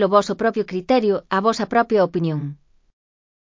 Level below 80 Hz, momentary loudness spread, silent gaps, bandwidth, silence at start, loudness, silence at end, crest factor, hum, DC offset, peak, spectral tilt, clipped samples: -58 dBFS; 8 LU; none; 7.6 kHz; 0 s; -20 LUFS; 0.95 s; 18 dB; none; under 0.1%; -2 dBFS; -6.5 dB/octave; under 0.1%